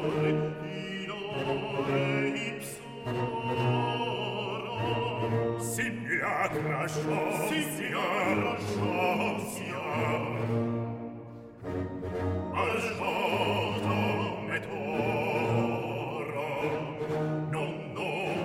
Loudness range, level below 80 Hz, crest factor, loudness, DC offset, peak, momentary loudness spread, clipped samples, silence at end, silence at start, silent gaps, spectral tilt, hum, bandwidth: 3 LU; -60 dBFS; 16 dB; -31 LUFS; under 0.1%; -14 dBFS; 7 LU; under 0.1%; 0 s; 0 s; none; -5.5 dB/octave; none; 16 kHz